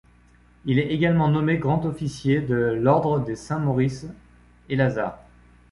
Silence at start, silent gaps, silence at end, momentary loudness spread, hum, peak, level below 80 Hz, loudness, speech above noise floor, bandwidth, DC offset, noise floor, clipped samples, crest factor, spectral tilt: 0.65 s; none; 0.55 s; 9 LU; 60 Hz at -45 dBFS; -6 dBFS; -50 dBFS; -23 LUFS; 33 dB; 11.5 kHz; under 0.1%; -55 dBFS; under 0.1%; 18 dB; -8 dB/octave